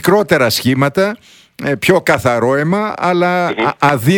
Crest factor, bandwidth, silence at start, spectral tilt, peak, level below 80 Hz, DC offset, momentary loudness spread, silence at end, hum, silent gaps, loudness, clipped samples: 14 dB; 19.5 kHz; 0 s; -5.5 dB/octave; 0 dBFS; -48 dBFS; under 0.1%; 6 LU; 0 s; none; none; -14 LUFS; 0.1%